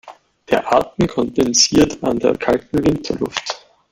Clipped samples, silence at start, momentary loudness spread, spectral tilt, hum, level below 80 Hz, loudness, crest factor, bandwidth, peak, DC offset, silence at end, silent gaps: under 0.1%; 0.05 s; 10 LU; -3.5 dB/octave; none; -42 dBFS; -17 LUFS; 16 dB; 16 kHz; 0 dBFS; under 0.1%; 0.35 s; none